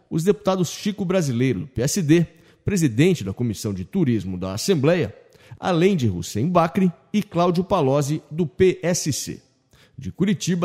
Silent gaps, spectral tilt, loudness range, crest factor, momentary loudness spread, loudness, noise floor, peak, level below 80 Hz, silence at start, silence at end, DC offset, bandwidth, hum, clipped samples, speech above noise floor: none; -6 dB/octave; 1 LU; 18 dB; 9 LU; -22 LUFS; -57 dBFS; -4 dBFS; -50 dBFS; 0.1 s; 0 s; under 0.1%; 16 kHz; none; under 0.1%; 36 dB